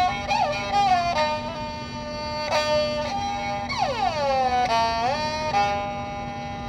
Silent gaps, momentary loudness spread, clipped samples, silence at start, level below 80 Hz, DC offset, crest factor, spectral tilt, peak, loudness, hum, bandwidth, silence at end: none; 10 LU; under 0.1%; 0 s; -46 dBFS; under 0.1%; 14 dB; -4 dB/octave; -10 dBFS; -24 LUFS; none; 13 kHz; 0 s